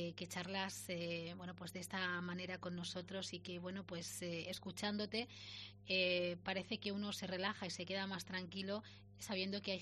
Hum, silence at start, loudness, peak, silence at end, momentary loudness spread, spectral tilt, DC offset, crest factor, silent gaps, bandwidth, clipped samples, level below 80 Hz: 50 Hz at -60 dBFS; 0 s; -44 LUFS; -24 dBFS; 0 s; 8 LU; -4 dB/octave; under 0.1%; 20 dB; none; 13 kHz; under 0.1%; -76 dBFS